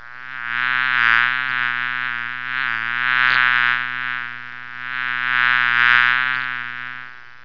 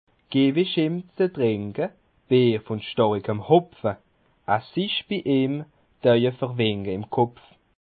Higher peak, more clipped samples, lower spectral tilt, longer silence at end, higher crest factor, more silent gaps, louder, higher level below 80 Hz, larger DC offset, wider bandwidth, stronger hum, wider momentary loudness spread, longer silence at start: first, 0 dBFS vs -4 dBFS; neither; second, -3 dB/octave vs -11 dB/octave; second, 0.1 s vs 0.5 s; about the same, 20 dB vs 20 dB; neither; first, -18 LUFS vs -24 LUFS; about the same, -68 dBFS vs -66 dBFS; first, 1% vs under 0.1%; first, 5.4 kHz vs 4.7 kHz; neither; first, 16 LU vs 10 LU; second, 0 s vs 0.3 s